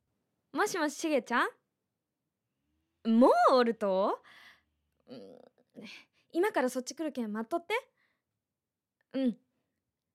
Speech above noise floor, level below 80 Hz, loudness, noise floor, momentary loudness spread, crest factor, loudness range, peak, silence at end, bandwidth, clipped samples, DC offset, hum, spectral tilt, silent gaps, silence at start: over 60 dB; -84 dBFS; -30 LUFS; under -90 dBFS; 25 LU; 20 dB; 8 LU; -12 dBFS; 0.8 s; 15 kHz; under 0.1%; under 0.1%; none; -4.5 dB/octave; none; 0.55 s